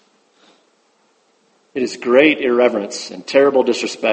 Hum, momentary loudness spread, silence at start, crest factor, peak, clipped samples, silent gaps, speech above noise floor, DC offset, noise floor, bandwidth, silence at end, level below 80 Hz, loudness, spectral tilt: none; 13 LU; 1.75 s; 18 dB; 0 dBFS; under 0.1%; none; 44 dB; under 0.1%; -59 dBFS; 8.8 kHz; 0 s; -66 dBFS; -16 LUFS; -3.5 dB/octave